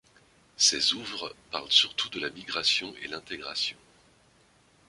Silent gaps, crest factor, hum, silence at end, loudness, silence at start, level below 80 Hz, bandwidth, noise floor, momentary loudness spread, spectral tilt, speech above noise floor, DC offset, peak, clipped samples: none; 24 dB; none; 1.15 s; -26 LUFS; 0.6 s; -68 dBFS; 11.5 kHz; -62 dBFS; 15 LU; 0.5 dB/octave; 33 dB; under 0.1%; -6 dBFS; under 0.1%